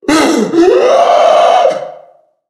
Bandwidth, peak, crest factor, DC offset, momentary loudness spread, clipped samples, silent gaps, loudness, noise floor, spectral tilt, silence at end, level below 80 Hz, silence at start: 13.5 kHz; 0 dBFS; 10 dB; under 0.1%; 8 LU; 0.2%; none; -8 LUFS; -43 dBFS; -4 dB/octave; 0.5 s; -48 dBFS; 0.05 s